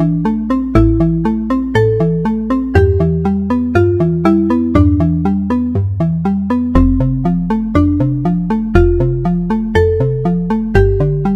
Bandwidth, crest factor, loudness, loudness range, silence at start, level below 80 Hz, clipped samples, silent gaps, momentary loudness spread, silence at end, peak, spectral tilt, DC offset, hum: 8 kHz; 12 dB; -14 LUFS; 1 LU; 0 s; -24 dBFS; under 0.1%; none; 4 LU; 0 s; 0 dBFS; -9.5 dB/octave; under 0.1%; none